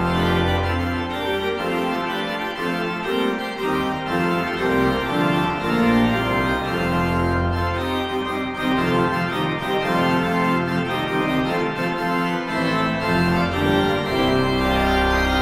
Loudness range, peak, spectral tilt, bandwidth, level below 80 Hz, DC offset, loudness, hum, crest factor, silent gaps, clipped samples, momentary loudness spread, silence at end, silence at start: 3 LU; -6 dBFS; -6 dB/octave; 16 kHz; -38 dBFS; under 0.1%; -21 LUFS; none; 14 dB; none; under 0.1%; 5 LU; 0 s; 0 s